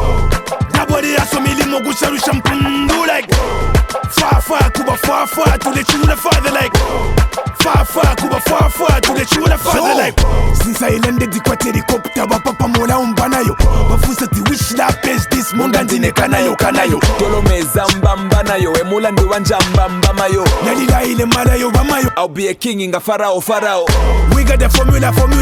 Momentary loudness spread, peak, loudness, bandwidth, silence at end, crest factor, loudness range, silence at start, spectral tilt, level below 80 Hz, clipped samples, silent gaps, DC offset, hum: 4 LU; 0 dBFS; -13 LUFS; 18 kHz; 0 s; 12 dB; 1 LU; 0 s; -4.5 dB/octave; -18 dBFS; under 0.1%; none; under 0.1%; none